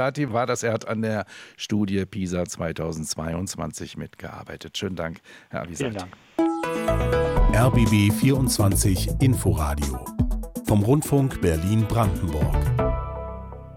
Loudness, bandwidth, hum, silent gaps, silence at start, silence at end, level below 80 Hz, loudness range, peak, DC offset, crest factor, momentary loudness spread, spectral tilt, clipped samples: -24 LUFS; 16.5 kHz; none; none; 0 s; 0 s; -32 dBFS; 10 LU; -8 dBFS; under 0.1%; 14 dB; 15 LU; -6 dB/octave; under 0.1%